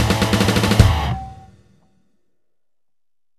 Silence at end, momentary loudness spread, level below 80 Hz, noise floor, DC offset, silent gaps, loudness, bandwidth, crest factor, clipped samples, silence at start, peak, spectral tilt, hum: 2.05 s; 14 LU; -28 dBFS; -89 dBFS; 0.1%; none; -16 LUFS; 14 kHz; 20 dB; under 0.1%; 0 s; 0 dBFS; -5.5 dB/octave; none